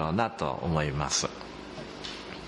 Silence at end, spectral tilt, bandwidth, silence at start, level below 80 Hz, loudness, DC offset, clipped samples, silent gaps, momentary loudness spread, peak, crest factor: 0 s; -4 dB/octave; 11.5 kHz; 0 s; -50 dBFS; -30 LUFS; under 0.1%; under 0.1%; none; 13 LU; -12 dBFS; 20 dB